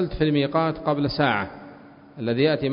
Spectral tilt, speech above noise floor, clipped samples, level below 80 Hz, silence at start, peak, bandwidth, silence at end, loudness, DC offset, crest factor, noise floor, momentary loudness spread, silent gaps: -11 dB/octave; 23 dB; under 0.1%; -46 dBFS; 0 s; -6 dBFS; 5.4 kHz; 0 s; -23 LUFS; under 0.1%; 16 dB; -46 dBFS; 11 LU; none